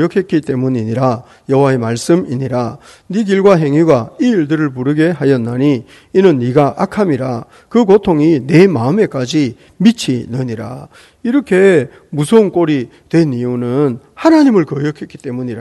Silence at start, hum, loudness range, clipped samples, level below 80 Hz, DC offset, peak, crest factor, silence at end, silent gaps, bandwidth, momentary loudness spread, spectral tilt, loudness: 0 s; none; 2 LU; 0.4%; -50 dBFS; under 0.1%; 0 dBFS; 12 dB; 0 s; none; 12.5 kHz; 11 LU; -7 dB/octave; -13 LUFS